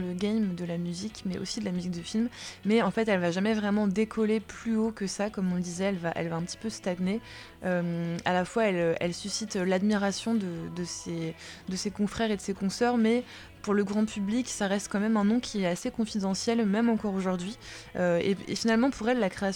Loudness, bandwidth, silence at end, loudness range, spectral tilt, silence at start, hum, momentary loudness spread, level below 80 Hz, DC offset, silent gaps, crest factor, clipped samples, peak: -29 LUFS; 12.5 kHz; 0 s; 3 LU; -5.5 dB/octave; 0 s; none; 9 LU; -58 dBFS; under 0.1%; none; 18 dB; under 0.1%; -10 dBFS